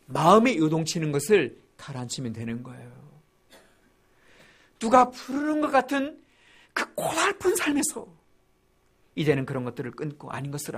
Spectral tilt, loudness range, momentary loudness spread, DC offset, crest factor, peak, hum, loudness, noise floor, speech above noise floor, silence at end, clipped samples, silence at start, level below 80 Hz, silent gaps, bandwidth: -4.5 dB/octave; 6 LU; 17 LU; under 0.1%; 24 dB; -4 dBFS; none; -25 LUFS; -65 dBFS; 40 dB; 0 s; under 0.1%; 0.1 s; -62 dBFS; none; 15.5 kHz